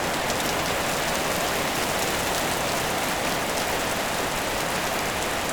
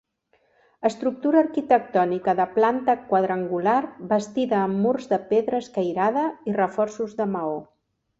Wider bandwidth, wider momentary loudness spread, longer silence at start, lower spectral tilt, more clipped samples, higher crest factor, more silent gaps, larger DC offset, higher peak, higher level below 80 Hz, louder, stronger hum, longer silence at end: first, over 20 kHz vs 8 kHz; second, 1 LU vs 6 LU; second, 0 s vs 0.8 s; second, -2.5 dB/octave vs -7 dB/octave; neither; about the same, 18 dB vs 18 dB; neither; neither; about the same, -8 dBFS vs -6 dBFS; first, -44 dBFS vs -66 dBFS; about the same, -24 LUFS vs -23 LUFS; neither; second, 0 s vs 0.55 s